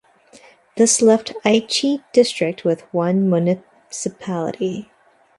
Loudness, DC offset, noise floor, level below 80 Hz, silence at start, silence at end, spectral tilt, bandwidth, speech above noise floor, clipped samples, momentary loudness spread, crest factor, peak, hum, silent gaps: -18 LUFS; under 0.1%; -49 dBFS; -64 dBFS; 0.75 s; 0.55 s; -4.5 dB/octave; 11.5 kHz; 31 dB; under 0.1%; 13 LU; 18 dB; -2 dBFS; none; none